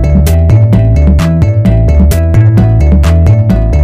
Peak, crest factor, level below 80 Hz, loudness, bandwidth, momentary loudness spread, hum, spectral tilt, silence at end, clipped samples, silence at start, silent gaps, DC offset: 0 dBFS; 6 dB; -10 dBFS; -7 LUFS; 15.5 kHz; 2 LU; none; -8 dB/octave; 0 s; 2%; 0 s; none; under 0.1%